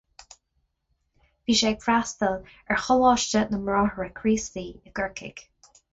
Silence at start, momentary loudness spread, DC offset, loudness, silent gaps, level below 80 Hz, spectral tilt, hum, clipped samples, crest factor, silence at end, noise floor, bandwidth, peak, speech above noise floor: 1.5 s; 15 LU; under 0.1%; -24 LUFS; none; -50 dBFS; -3.5 dB/octave; none; under 0.1%; 18 dB; 0.5 s; -74 dBFS; 8 kHz; -8 dBFS; 49 dB